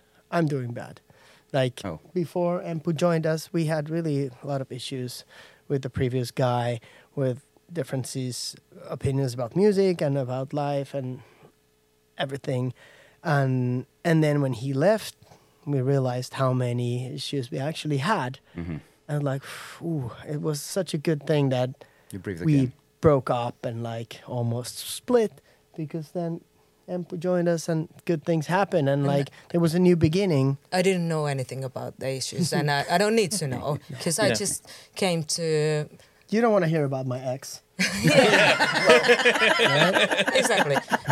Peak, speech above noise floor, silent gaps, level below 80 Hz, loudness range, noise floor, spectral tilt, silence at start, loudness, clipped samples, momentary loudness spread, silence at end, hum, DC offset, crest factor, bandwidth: 0 dBFS; 40 dB; none; -62 dBFS; 9 LU; -65 dBFS; -5 dB/octave; 0.3 s; -25 LUFS; under 0.1%; 15 LU; 0 s; none; under 0.1%; 26 dB; 15.5 kHz